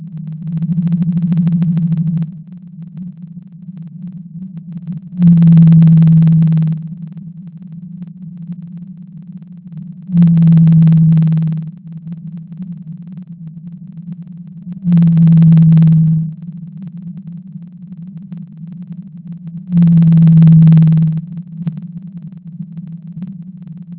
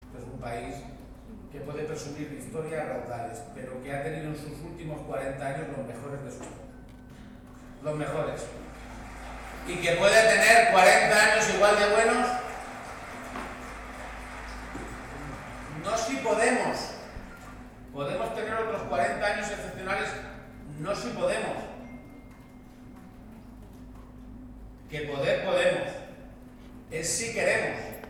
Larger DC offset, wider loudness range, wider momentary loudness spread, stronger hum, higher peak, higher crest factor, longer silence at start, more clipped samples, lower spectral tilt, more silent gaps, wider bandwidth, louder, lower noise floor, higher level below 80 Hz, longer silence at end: neither; second, 14 LU vs 17 LU; about the same, 25 LU vs 27 LU; neither; first, 0 dBFS vs -8 dBFS; second, 12 dB vs 22 dB; about the same, 0 s vs 0 s; neither; first, -13.5 dB/octave vs -3 dB/octave; neither; second, 3.6 kHz vs 20 kHz; first, -10 LUFS vs -26 LUFS; second, -32 dBFS vs -49 dBFS; first, -44 dBFS vs -50 dBFS; about the same, 0.05 s vs 0 s